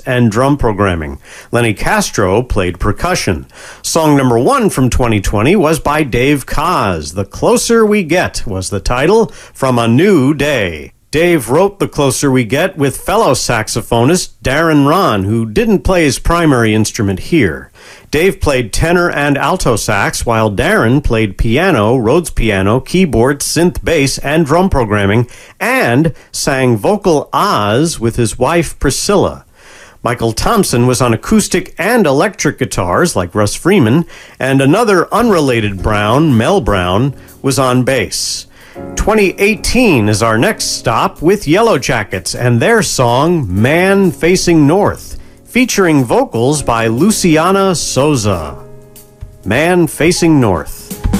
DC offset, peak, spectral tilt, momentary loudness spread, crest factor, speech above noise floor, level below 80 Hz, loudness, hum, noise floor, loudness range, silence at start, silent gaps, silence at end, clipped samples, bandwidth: under 0.1%; 0 dBFS; -5 dB/octave; 7 LU; 12 dB; 27 dB; -26 dBFS; -12 LUFS; none; -38 dBFS; 2 LU; 0.05 s; none; 0 s; under 0.1%; 16 kHz